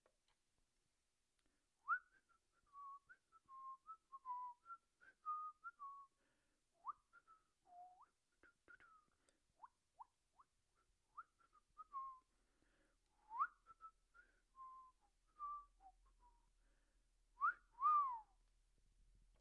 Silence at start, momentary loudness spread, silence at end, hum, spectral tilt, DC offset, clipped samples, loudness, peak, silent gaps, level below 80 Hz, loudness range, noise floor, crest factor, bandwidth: 1.85 s; 24 LU; 1.2 s; none; -2.5 dB/octave; under 0.1%; under 0.1%; -48 LUFS; -30 dBFS; none; -84 dBFS; 22 LU; -90 dBFS; 22 dB; 9.6 kHz